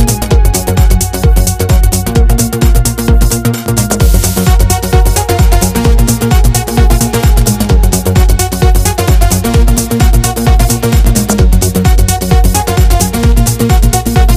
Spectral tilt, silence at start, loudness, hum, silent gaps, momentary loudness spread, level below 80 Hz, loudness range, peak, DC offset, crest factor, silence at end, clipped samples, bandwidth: -5 dB/octave; 0 s; -10 LUFS; none; none; 1 LU; -10 dBFS; 1 LU; 0 dBFS; under 0.1%; 8 dB; 0 s; 0.7%; 16 kHz